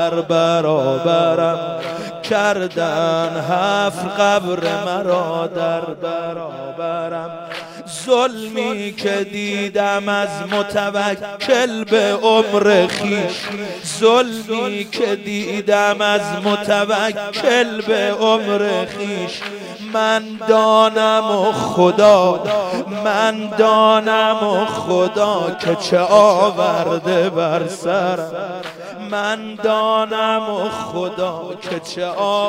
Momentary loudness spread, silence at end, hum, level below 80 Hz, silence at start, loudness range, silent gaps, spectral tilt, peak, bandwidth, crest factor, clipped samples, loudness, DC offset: 12 LU; 0 s; none; -62 dBFS; 0 s; 6 LU; none; -4.5 dB/octave; 0 dBFS; 16 kHz; 16 dB; under 0.1%; -17 LUFS; under 0.1%